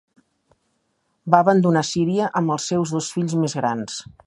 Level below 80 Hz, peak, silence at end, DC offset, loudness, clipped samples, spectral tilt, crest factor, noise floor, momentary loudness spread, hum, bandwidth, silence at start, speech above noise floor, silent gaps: -62 dBFS; 0 dBFS; 0.25 s; under 0.1%; -20 LUFS; under 0.1%; -5.5 dB/octave; 20 dB; -70 dBFS; 9 LU; none; 11.5 kHz; 1.25 s; 50 dB; none